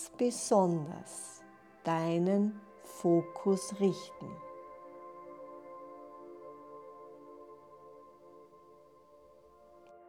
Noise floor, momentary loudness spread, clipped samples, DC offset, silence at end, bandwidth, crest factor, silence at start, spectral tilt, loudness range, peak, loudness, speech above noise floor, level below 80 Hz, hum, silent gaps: -60 dBFS; 24 LU; under 0.1%; under 0.1%; 0.15 s; 16 kHz; 20 dB; 0 s; -6 dB/octave; 21 LU; -16 dBFS; -33 LUFS; 28 dB; -80 dBFS; none; none